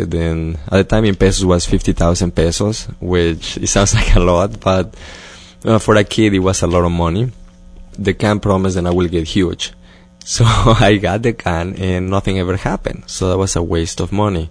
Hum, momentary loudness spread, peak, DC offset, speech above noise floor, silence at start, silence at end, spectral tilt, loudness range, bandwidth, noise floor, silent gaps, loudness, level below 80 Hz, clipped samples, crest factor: none; 9 LU; 0 dBFS; under 0.1%; 23 dB; 0 s; 0 s; -5 dB/octave; 3 LU; 10.5 kHz; -37 dBFS; none; -15 LUFS; -24 dBFS; under 0.1%; 14 dB